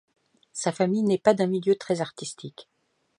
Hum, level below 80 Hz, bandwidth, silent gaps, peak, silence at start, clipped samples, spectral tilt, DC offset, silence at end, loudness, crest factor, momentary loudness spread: none; -72 dBFS; 11.5 kHz; none; -6 dBFS; 0.55 s; under 0.1%; -5.5 dB/octave; under 0.1%; 0.55 s; -25 LUFS; 22 dB; 17 LU